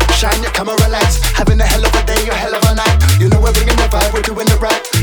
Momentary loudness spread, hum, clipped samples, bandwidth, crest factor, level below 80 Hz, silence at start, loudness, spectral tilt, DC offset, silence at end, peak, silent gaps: 4 LU; none; under 0.1%; over 20 kHz; 12 dB; -14 dBFS; 0 s; -13 LUFS; -4.5 dB/octave; under 0.1%; 0 s; 0 dBFS; none